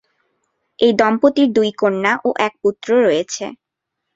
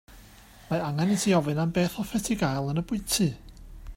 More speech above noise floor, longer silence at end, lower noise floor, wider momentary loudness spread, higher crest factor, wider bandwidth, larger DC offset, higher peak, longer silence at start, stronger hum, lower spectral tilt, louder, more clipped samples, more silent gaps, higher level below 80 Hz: first, 63 dB vs 25 dB; first, 0.6 s vs 0 s; first, -78 dBFS vs -51 dBFS; about the same, 8 LU vs 7 LU; about the same, 16 dB vs 16 dB; second, 7.8 kHz vs 16.5 kHz; neither; first, -2 dBFS vs -10 dBFS; first, 0.8 s vs 0.1 s; neither; about the same, -4.5 dB/octave vs -5 dB/octave; first, -16 LUFS vs -27 LUFS; neither; neither; second, -62 dBFS vs -48 dBFS